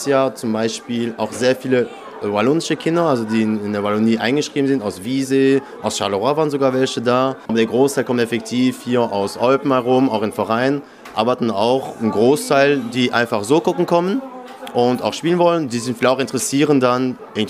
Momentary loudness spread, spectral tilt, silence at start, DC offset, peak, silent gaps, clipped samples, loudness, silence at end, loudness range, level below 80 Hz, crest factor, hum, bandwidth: 7 LU; -5 dB/octave; 0 s; under 0.1%; 0 dBFS; none; under 0.1%; -18 LUFS; 0 s; 1 LU; -64 dBFS; 18 dB; none; 15.5 kHz